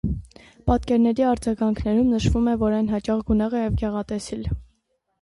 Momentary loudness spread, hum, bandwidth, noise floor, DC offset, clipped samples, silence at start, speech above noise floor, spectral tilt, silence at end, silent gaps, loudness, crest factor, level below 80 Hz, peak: 10 LU; none; 11.5 kHz; -70 dBFS; under 0.1%; under 0.1%; 0.05 s; 49 dB; -7.5 dB/octave; 0.6 s; none; -23 LUFS; 14 dB; -34 dBFS; -8 dBFS